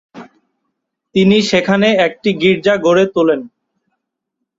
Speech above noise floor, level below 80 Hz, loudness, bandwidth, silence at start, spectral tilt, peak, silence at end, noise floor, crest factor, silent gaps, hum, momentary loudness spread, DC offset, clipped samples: 64 dB; -54 dBFS; -13 LUFS; 7.8 kHz; 0.15 s; -5.5 dB/octave; 0 dBFS; 1.1 s; -76 dBFS; 14 dB; none; none; 4 LU; under 0.1%; under 0.1%